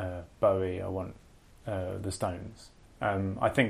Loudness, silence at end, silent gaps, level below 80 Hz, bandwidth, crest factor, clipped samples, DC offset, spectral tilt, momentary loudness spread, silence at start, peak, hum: -32 LUFS; 0 s; none; -56 dBFS; 14 kHz; 22 dB; under 0.1%; under 0.1%; -6 dB/octave; 16 LU; 0 s; -10 dBFS; none